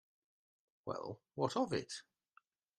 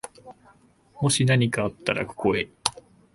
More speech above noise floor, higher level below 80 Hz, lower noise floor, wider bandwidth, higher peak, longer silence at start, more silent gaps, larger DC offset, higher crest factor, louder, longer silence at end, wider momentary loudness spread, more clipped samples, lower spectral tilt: about the same, 33 dB vs 34 dB; second, -78 dBFS vs -54 dBFS; first, -73 dBFS vs -57 dBFS; about the same, 12.5 kHz vs 12 kHz; second, -20 dBFS vs 0 dBFS; first, 0.85 s vs 0.05 s; neither; neither; about the same, 24 dB vs 26 dB; second, -41 LUFS vs -24 LUFS; first, 0.75 s vs 0.45 s; first, 13 LU vs 9 LU; neither; about the same, -5 dB/octave vs -4.5 dB/octave